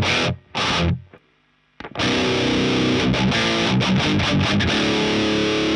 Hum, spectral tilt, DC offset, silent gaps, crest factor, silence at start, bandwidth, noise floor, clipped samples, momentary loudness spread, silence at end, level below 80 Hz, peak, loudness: none; -5 dB/octave; under 0.1%; none; 12 dB; 0 s; 11 kHz; -61 dBFS; under 0.1%; 5 LU; 0 s; -40 dBFS; -8 dBFS; -19 LUFS